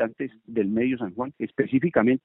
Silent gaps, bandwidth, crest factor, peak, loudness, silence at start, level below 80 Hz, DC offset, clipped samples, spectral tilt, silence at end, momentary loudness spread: none; 3.9 kHz; 18 dB; -6 dBFS; -26 LUFS; 0 s; -62 dBFS; under 0.1%; under 0.1%; -7 dB/octave; 0.05 s; 10 LU